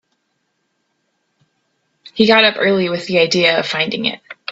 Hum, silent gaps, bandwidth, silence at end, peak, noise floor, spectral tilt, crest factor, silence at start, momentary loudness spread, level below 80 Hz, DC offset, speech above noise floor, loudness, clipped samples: none; none; 8 kHz; 0 s; 0 dBFS; -69 dBFS; -4.5 dB/octave; 18 dB; 2.15 s; 11 LU; -60 dBFS; under 0.1%; 54 dB; -14 LUFS; under 0.1%